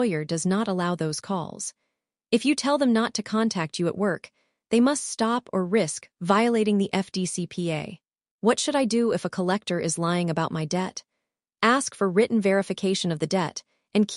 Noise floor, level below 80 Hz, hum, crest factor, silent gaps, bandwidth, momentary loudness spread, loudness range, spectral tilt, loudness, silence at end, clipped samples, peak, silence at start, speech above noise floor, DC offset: -83 dBFS; -68 dBFS; none; 20 dB; 8.31-8.39 s; 11.5 kHz; 8 LU; 1 LU; -5 dB/octave; -25 LUFS; 0 s; under 0.1%; -6 dBFS; 0 s; 58 dB; under 0.1%